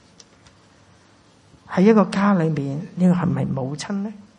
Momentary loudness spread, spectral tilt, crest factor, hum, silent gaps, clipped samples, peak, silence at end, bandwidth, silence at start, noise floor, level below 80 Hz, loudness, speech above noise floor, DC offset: 12 LU; -7.5 dB/octave; 18 dB; none; none; under 0.1%; -2 dBFS; 0.15 s; 10 kHz; 1.7 s; -53 dBFS; -58 dBFS; -20 LUFS; 34 dB; under 0.1%